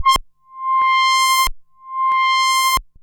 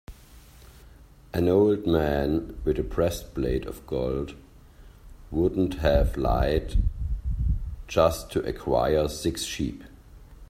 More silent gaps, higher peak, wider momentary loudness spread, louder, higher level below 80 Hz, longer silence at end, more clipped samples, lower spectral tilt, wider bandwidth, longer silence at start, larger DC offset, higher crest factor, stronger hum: neither; about the same, -6 dBFS vs -8 dBFS; about the same, 8 LU vs 10 LU; first, -16 LUFS vs -26 LUFS; about the same, -38 dBFS vs -34 dBFS; first, 0.2 s vs 0.05 s; neither; second, 1 dB/octave vs -6.5 dB/octave; first, over 20 kHz vs 16 kHz; about the same, 0 s vs 0.1 s; neither; second, 12 dB vs 18 dB; neither